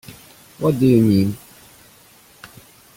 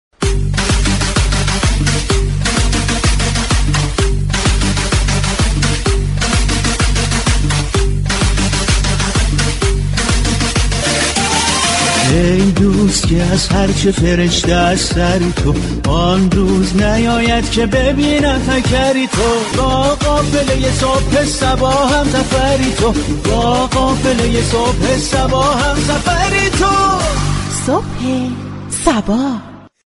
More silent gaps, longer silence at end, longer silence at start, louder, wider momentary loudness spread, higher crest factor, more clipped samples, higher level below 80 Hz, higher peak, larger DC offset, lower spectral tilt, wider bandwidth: neither; first, 0.5 s vs 0.2 s; about the same, 0.1 s vs 0.2 s; second, -17 LUFS vs -14 LUFS; first, 20 LU vs 4 LU; first, 18 dB vs 12 dB; neither; second, -52 dBFS vs -20 dBFS; second, -4 dBFS vs 0 dBFS; neither; first, -8 dB/octave vs -4.5 dB/octave; first, 17 kHz vs 11.5 kHz